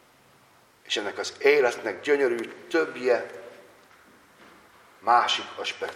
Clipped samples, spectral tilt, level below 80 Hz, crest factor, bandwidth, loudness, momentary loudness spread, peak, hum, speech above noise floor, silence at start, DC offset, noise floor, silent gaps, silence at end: under 0.1%; -2.5 dB/octave; -78 dBFS; 22 dB; 15 kHz; -25 LUFS; 11 LU; -6 dBFS; none; 33 dB; 0.9 s; under 0.1%; -58 dBFS; none; 0 s